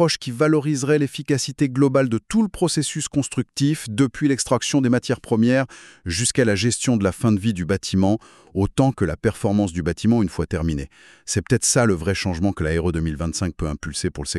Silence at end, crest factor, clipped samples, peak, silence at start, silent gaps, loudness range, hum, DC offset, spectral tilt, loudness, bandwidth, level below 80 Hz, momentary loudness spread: 0 s; 16 dB; under 0.1%; -4 dBFS; 0 s; none; 2 LU; none; under 0.1%; -5 dB/octave; -21 LUFS; 13 kHz; -40 dBFS; 8 LU